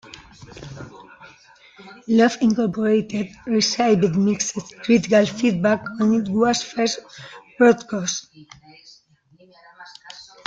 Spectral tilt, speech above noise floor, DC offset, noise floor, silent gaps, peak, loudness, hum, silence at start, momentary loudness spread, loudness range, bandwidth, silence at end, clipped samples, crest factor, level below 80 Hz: -4.5 dB/octave; 36 dB; under 0.1%; -55 dBFS; none; -4 dBFS; -20 LUFS; none; 0.4 s; 23 LU; 5 LU; 7.8 kHz; 0.25 s; under 0.1%; 18 dB; -58 dBFS